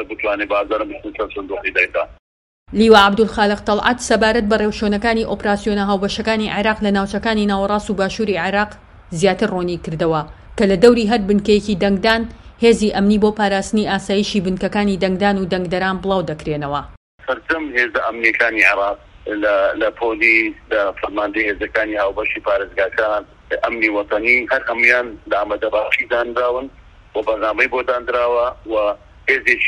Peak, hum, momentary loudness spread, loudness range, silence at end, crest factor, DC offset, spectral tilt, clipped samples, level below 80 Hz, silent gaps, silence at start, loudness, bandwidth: 0 dBFS; none; 10 LU; 4 LU; 0 s; 18 dB; under 0.1%; -5 dB/octave; under 0.1%; -40 dBFS; 2.19-2.66 s, 16.97-17.18 s; 0 s; -17 LUFS; 11.5 kHz